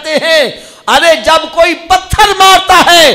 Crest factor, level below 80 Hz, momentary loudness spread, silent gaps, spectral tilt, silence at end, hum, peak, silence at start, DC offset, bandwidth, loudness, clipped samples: 8 dB; -28 dBFS; 7 LU; none; -2 dB/octave; 0 s; none; 0 dBFS; 0 s; under 0.1%; 17 kHz; -6 LUFS; 1%